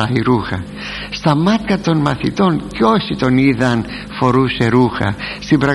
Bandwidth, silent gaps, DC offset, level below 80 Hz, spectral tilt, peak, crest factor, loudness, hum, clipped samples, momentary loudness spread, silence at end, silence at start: 11.5 kHz; none; under 0.1%; -38 dBFS; -7 dB/octave; 0 dBFS; 14 dB; -16 LUFS; none; under 0.1%; 10 LU; 0 s; 0 s